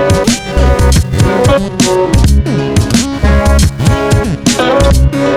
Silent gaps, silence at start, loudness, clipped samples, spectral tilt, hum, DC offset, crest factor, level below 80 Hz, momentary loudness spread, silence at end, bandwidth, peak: none; 0 s; -10 LUFS; under 0.1%; -5.5 dB/octave; none; under 0.1%; 8 dB; -14 dBFS; 3 LU; 0 s; 15 kHz; 0 dBFS